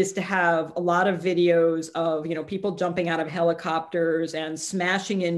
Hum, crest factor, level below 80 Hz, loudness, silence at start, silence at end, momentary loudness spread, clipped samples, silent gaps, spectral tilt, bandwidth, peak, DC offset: none; 16 dB; -68 dBFS; -24 LUFS; 0 s; 0 s; 7 LU; under 0.1%; none; -5 dB/octave; 12.5 kHz; -8 dBFS; under 0.1%